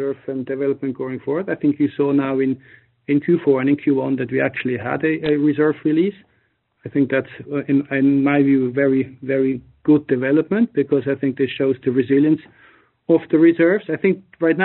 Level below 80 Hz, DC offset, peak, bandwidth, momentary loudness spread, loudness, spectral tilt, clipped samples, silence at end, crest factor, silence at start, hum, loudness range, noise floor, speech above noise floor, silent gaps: -62 dBFS; under 0.1%; -4 dBFS; 4.2 kHz; 8 LU; -19 LUFS; -6.5 dB/octave; under 0.1%; 0 s; 16 dB; 0 s; none; 2 LU; -65 dBFS; 47 dB; none